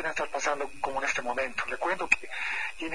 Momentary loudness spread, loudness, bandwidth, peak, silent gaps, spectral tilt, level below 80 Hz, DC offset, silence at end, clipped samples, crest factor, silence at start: 6 LU; -30 LUFS; 10.5 kHz; -6 dBFS; none; -2 dB/octave; -58 dBFS; 1%; 0 s; under 0.1%; 26 dB; 0 s